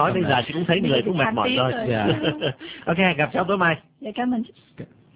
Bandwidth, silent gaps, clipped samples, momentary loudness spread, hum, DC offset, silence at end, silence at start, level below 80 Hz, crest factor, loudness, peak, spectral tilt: 4 kHz; none; under 0.1%; 12 LU; none; under 0.1%; 0.3 s; 0 s; -52 dBFS; 18 dB; -22 LUFS; -4 dBFS; -10 dB/octave